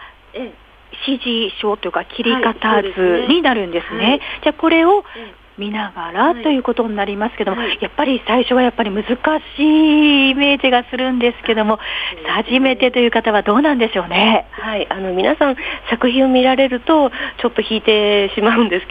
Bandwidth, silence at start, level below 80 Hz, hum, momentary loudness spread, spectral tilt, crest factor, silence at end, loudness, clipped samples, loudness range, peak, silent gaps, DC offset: 5 kHz; 0 s; -44 dBFS; none; 9 LU; -7 dB/octave; 16 dB; 0 s; -15 LUFS; under 0.1%; 3 LU; 0 dBFS; none; under 0.1%